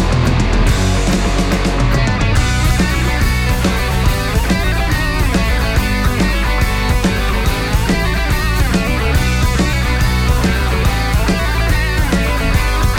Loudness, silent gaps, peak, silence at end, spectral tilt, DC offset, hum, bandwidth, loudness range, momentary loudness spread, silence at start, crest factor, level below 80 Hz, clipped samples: -15 LUFS; none; 0 dBFS; 0 s; -5 dB/octave; under 0.1%; none; 18 kHz; 1 LU; 1 LU; 0 s; 12 dB; -16 dBFS; under 0.1%